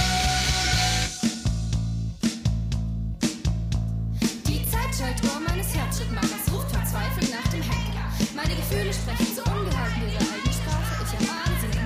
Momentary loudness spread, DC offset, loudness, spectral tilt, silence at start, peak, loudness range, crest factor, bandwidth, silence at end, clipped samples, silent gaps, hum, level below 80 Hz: 6 LU; under 0.1%; -26 LUFS; -4.5 dB/octave; 0 s; -8 dBFS; 2 LU; 16 dB; 16 kHz; 0 s; under 0.1%; none; none; -30 dBFS